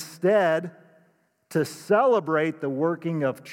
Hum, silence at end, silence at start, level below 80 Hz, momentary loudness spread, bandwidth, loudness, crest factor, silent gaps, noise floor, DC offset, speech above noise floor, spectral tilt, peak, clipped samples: none; 0 s; 0 s; -84 dBFS; 8 LU; 17 kHz; -24 LUFS; 18 dB; none; -65 dBFS; under 0.1%; 41 dB; -6.5 dB/octave; -8 dBFS; under 0.1%